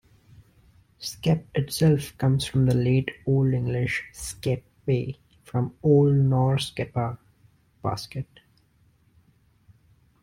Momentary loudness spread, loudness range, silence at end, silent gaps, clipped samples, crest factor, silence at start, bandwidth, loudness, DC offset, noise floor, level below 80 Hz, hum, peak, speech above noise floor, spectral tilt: 15 LU; 8 LU; 2 s; none; under 0.1%; 18 dB; 1 s; 15.5 kHz; -25 LUFS; under 0.1%; -62 dBFS; -52 dBFS; none; -8 dBFS; 39 dB; -6.5 dB/octave